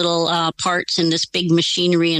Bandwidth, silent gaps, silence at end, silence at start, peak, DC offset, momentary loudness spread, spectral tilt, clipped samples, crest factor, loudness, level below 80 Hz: 11 kHz; none; 0 s; 0 s; -6 dBFS; under 0.1%; 3 LU; -4 dB/octave; under 0.1%; 12 dB; -18 LUFS; -60 dBFS